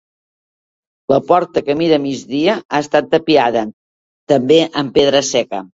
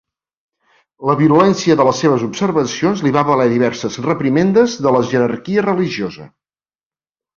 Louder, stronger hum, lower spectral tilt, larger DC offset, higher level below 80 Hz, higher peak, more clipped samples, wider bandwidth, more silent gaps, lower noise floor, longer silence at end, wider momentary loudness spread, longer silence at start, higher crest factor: about the same, -15 LUFS vs -15 LUFS; neither; second, -4.5 dB/octave vs -6 dB/octave; neither; about the same, -54 dBFS vs -54 dBFS; about the same, 0 dBFS vs -2 dBFS; neither; about the same, 8 kHz vs 7.4 kHz; first, 2.65-2.69 s, 3.73-4.27 s vs none; about the same, under -90 dBFS vs under -90 dBFS; second, 0.1 s vs 1.1 s; about the same, 6 LU vs 7 LU; about the same, 1.1 s vs 1 s; about the same, 16 dB vs 14 dB